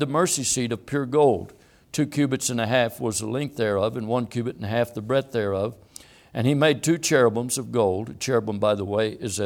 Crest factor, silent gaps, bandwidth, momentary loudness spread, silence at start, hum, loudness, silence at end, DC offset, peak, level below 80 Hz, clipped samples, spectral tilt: 18 dB; none; 18 kHz; 8 LU; 0 s; none; -24 LUFS; 0 s; under 0.1%; -6 dBFS; -60 dBFS; under 0.1%; -4.5 dB/octave